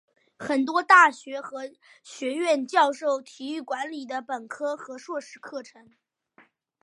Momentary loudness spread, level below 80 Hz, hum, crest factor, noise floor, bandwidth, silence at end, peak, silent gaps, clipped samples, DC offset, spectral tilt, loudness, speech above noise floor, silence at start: 22 LU; -82 dBFS; none; 24 dB; -61 dBFS; 11.5 kHz; 1.2 s; -4 dBFS; none; under 0.1%; under 0.1%; -2.5 dB/octave; -24 LUFS; 35 dB; 0.4 s